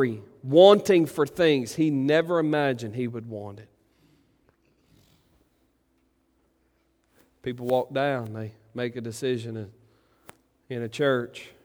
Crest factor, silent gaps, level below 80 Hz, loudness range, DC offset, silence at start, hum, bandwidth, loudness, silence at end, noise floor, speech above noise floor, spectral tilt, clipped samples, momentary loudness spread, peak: 24 dB; none; -68 dBFS; 18 LU; under 0.1%; 0 s; none; over 20 kHz; -24 LUFS; 0.2 s; -69 dBFS; 45 dB; -6 dB/octave; under 0.1%; 20 LU; -2 dBFS